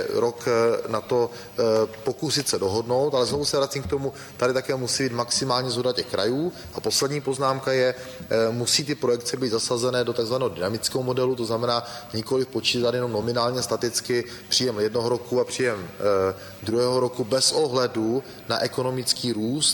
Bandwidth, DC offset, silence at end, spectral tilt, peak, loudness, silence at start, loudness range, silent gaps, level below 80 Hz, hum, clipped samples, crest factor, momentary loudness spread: over 20 kHz; under 0.1%; 0 s; -3.5 dB/octave; -6 dBFS; -24 LUFS; 0 s; 1 LU; none; -56 dBFS; none; under 0.1%; 18 dB; 5 LU